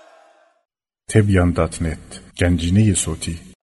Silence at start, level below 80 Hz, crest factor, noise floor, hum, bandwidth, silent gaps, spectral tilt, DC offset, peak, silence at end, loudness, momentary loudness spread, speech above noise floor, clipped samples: 1.1 s; -36 dBFS; 18 dB; -53 dBFS; none; 11.5 kHz; none; -5.5 dB/octave; under 0.1%; -2 dBFS; 0.3 s; -19 LUFS; 15 LU; 36 dB; under 0.1%